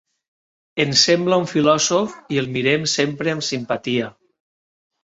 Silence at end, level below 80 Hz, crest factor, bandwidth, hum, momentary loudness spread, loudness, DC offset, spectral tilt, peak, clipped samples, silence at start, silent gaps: 0.95 s; -60 dBFS; 20 dB; 8.2 kHz; none; 9 LU; -19 LUFS; under 0.1%; -3.5 dB/octave; -2 dBFS; under 0.1%; 0.75 s; none